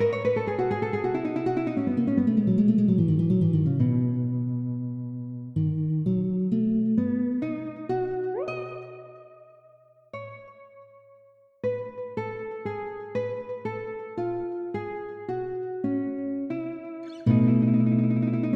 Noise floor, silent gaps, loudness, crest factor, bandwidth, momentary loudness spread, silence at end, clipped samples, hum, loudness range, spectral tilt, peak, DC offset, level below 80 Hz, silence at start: -57 dBFS; none; -27 LUFS; 18 dB; 5.8 kHz; 13 LU; 0 s; under 0.1%; none; 13 LU; -10.5 dB/octave; -8 dBFS; under 0.1%; -58 dBFS; 0 s